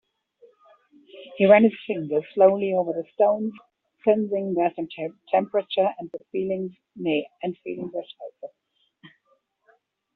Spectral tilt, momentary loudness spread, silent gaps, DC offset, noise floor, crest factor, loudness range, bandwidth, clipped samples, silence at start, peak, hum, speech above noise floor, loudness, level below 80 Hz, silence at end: -5 dB/octave; 18 LU; none; under 0.1%; -68 dBFS; 22 dB; 10 LU; 4.2 kHz; under 0.1%; 1.15 s; -4 dBFS; none; 45 dB; -24 LUFS; -70 dBFS; 1.1 s